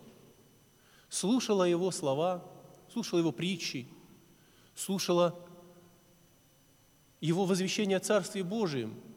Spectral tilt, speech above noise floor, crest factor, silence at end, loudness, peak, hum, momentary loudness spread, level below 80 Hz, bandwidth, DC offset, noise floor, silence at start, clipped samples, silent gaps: -5 dB/octave; 33 dB; 18 dB; 0 s; -32 LUFS; -16 dBFS; none; 13 LU; -76 dBFS; 19 kHz; under 0.1%; -64 dBFS; 0.05 s; under 0.1%; none